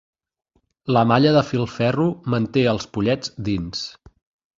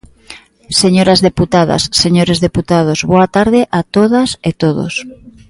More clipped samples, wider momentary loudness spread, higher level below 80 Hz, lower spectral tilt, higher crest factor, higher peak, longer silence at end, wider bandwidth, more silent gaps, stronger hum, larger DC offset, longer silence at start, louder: neither; first, 12 LU vs 6 LU; second, -48 dBFS vs -38 dBFS; first, -6.5 dB/octave vs -5 dB/octave; first, 20 dB vs 12 dB; about the same, -2 dBFS vs 0 dBFS; first, 0.7 s vs 0.2 s; second, 7.6 kHz vs 11.5 kHz; neither; neither; neither; first, 0.85 s vs 0.3 s; second, -20 LUFS vs -11 LUFS